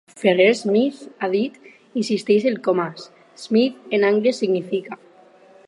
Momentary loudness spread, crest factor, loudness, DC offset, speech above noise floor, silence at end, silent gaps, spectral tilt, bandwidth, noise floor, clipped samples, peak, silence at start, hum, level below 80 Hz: 13 LU; 18 dB; -20 LUFS; under 0.1%; 30 dB; 0.75 s; none; -5.5 dB/octave; 11 kHz; -50 dBFS; under 0.1%; -2 dBFS; 0.15 s; none; -76 dBFS